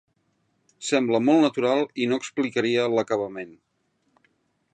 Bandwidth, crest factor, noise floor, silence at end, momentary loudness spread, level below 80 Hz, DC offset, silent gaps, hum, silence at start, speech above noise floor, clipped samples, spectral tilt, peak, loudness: 9.4 kHz; 18 dB; -71 dBFS; 1.25 s; 14 LU; -74 dBFS; under 0.1%; none; none; 0.8 s; 48 dB; under 0.1%; -5 dB/octave; -8 dBFS; -23 LUFS